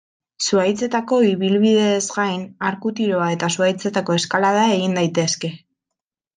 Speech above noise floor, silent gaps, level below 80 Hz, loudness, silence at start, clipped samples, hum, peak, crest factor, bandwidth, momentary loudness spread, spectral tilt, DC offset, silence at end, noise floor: 65 dB; none; -66 dBFS; -19 LUFS; 0.4 s; under 0.1%; none; -2 dBFS; 16 dB; 9.8 kHz; 7 LU; -4.5 dB/octave; under 0.1%; 0.8 s; -84 dBFS